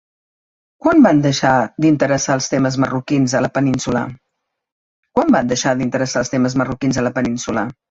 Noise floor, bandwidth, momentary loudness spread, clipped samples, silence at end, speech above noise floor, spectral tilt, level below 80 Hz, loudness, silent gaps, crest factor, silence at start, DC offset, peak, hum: -75 dBFS; 8 kHz; 8 LU; under 0.1%; 0.2 s; 60 dB; -5.5 dB/octave; -48 dBFS; -16 LUFS; 4.72-5.03 s; 16 dB; 0.85 s; under 0.1%; -2 dBFS; none